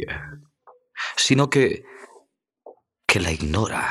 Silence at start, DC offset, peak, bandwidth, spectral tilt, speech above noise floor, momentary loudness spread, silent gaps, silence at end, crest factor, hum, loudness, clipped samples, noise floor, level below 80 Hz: 0 s; under 0.1%; -2 dBFS; 14.5 kHz; -4 dB/octave; 37 dB; 16 LU; none; 0 s; 24 dB; none; -21 LUFS; under 0.1%; -59 dBFS; -44 dBFS